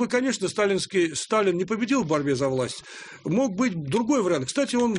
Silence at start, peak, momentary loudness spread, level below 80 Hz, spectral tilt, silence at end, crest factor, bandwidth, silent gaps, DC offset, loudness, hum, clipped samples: 0 s; -10 dBFS; 5 LU; -62 dBFS; -4.5 dB/octave; 0 s; 14 dB; 10.5 kHz; none; under 0.1%; -24 LUFS; none; under 0.1%